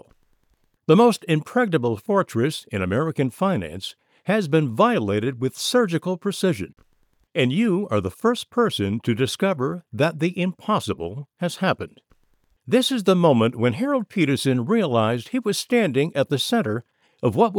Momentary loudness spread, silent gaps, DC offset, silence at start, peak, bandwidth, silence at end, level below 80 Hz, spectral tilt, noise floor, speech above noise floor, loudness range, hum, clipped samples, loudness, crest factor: 10 LU; none; under 0.1%; 0.9 s; -4 dBFS; 19 kHz; 0 s; -60 dBFS; -6 dB/octave; -66 dBFS; 44 dB; 3 LU; none; under 0.1%; -22 LUFS; 18 dB